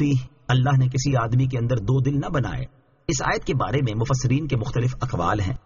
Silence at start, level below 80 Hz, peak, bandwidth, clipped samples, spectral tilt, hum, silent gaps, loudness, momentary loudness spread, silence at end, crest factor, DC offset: 0 s; -40 dBFS; -8 dBFS; 7.2 kHz; under 0.1%; -6.5 dB/octave; none; none; -23 LUFS; 6 LU; 0.05 s; 14 dB; under 0.1%